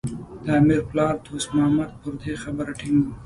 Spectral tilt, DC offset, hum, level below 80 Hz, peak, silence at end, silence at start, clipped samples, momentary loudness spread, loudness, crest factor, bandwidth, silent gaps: -6.5 dB/octave; under 0.1%; none; -46 dBFS; -6 dBFS; 0 s; 0.05 s; under 0.1%; 13 LU; -23 LUFS; 16 dB; 11.5 kHz; none